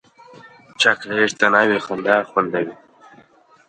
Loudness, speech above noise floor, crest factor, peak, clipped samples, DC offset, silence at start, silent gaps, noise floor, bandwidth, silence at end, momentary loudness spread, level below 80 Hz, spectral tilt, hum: -18 LUFS; 33 dB; 20 dB; 0 dBFS; under 0.1%; under 0.1%; 0.8 s; none; -52 dBFS; 9.6 kHz; 0.95 s; 8 LU; -66 dBFS; -3.5 dB/octave; none